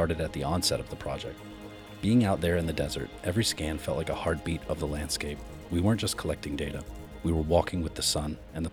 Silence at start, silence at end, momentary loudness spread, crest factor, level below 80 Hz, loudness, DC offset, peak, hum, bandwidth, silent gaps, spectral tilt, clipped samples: 0 s; 0 s; 11 LU; 20 dB; -44 dBFS; -30 LUFS; under 0.1%; -10 dBFS; none; over 20 kHz; none; -5 dB/octave; under 0.1%